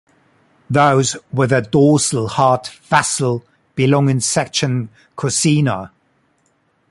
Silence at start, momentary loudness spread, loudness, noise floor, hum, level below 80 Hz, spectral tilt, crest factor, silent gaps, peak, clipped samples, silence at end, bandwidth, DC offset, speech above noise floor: 0.7 s; 11 LU; -16 LUFS; -62 dBFS; none; -52 dBFS; -4.5 dB/octave; 16 dB; none; 0 dBFS; under 0.1%; 1.05 s; 11.5 kHz; under 0.1%; 46 dB